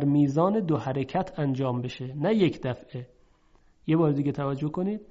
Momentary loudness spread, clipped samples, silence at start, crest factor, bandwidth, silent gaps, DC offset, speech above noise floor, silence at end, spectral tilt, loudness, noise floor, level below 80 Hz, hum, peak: 11 LU; under 0.1%; 0 s; 16 dB; 7.6 kHz; none; under 0.1%; 34 dB; 0.1 s; -8.5 dB/octave; -27 LUFS; -60 dBFS; -60 dBFS; none; -10 dBFS